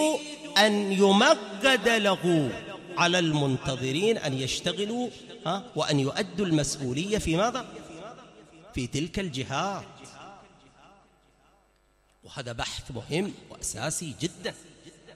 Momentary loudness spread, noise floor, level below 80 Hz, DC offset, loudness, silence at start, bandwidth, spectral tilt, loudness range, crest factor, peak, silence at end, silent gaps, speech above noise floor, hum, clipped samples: 17 LU; -65 dBFS; -52 dBFS; under 0.1%; -27 LUFS; 0 s; 14 kHz; -4 dB/octave; 14 LU; 22 dB; -6 dBFS; 0 s; none; 38 dB; none; under 0.1%